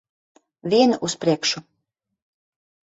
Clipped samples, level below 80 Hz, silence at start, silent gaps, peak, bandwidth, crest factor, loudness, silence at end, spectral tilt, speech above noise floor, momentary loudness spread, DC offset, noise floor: under 0.1%; -66 dBFS; 0.65 s; none; -4 dBFS; 8 kHz; 20 dB; -21 LUFS; 1.3 s; -4 dB/octave; 58 dB; 12 LU; under 0.1%; -78 dBFS